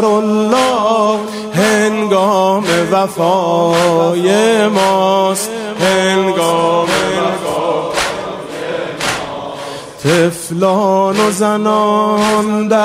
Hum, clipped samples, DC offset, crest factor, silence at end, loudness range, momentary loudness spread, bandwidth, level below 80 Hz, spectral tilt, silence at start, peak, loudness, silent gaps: none; under 0.1%; under 0.1%; 12 dB; 0 s; 5 LU; 8 LU; 16 kHz; -50 dBFS; -4.5 dB/octave; 0 s; 0 dBFS; -13 LUFS; none